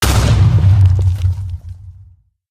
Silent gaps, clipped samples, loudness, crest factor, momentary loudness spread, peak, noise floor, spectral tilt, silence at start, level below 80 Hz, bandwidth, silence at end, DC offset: none; under 0.1%; -13 LUFS; 12 dB; 17 LU; 0 dBFS; -45 dBFS; -5.5 dB/octave; 0 s; -22 dBFS; 15 kHz; 0.6 s; under 0.1%